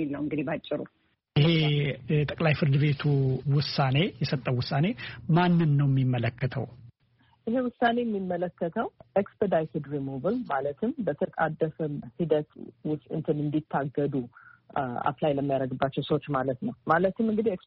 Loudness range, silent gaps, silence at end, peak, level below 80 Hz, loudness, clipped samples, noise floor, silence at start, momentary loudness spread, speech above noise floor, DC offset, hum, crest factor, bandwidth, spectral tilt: 5 LU; none; 0.1 s; -8 dBFS; -58 dBFS; -28 LUFS; under 0.1%; -65 dBFS; 0 s; 10 LU; 38 dB; under 0.1%; none; 18 dB; 5.8 kHz; -6 dB/octave